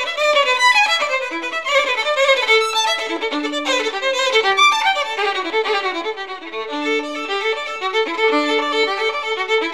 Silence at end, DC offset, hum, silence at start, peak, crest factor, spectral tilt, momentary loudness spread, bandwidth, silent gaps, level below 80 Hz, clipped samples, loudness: 0 s; 0.5%; none; 0 s; -4 dBFS; 16 dB; 0.5 dB/octave; 9 LU; 15 kHz; none; -64 dBFS; under 0.1%; -17 LUFS